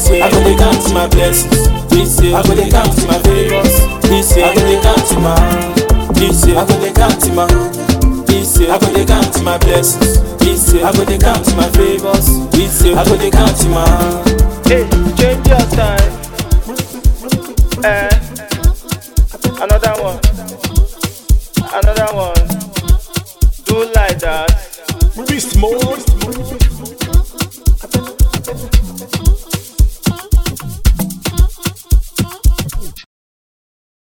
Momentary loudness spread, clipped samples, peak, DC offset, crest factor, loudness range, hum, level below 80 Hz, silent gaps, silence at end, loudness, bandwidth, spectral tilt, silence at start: 8 LU; 0.5%; 0 dBFS; 0.5%; 10 dB; 6 LU; none; -14 dBFS; none; 1.1 s; -12 LUFS; 18 kHz; -5 dB/octave; 0 s